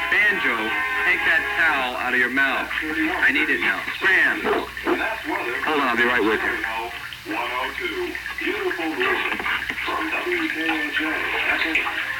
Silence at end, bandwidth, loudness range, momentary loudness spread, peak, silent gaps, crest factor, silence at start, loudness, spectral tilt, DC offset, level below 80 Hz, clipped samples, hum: 0 s; 18 kHz; 5 LU; 8 LU; -6 dBFS; none; 16 dB; 0 s; -21 LUFS; -3 dB/octave; under 0.1%; -50 dBFS; under 0.1%; none